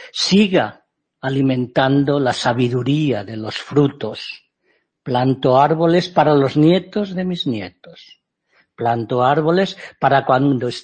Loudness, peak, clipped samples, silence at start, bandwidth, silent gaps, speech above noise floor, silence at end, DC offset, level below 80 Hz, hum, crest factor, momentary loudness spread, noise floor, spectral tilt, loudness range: -17 LUFS; 0 dBFS; under 0.1%; 0 s; 8.8 kHz; none; 48 dB; 0 s; under 0.1%; -56 dBFS; none; 16 dB; 12 LU; -65 dBFS; -6.5 dB/octave; 4 LU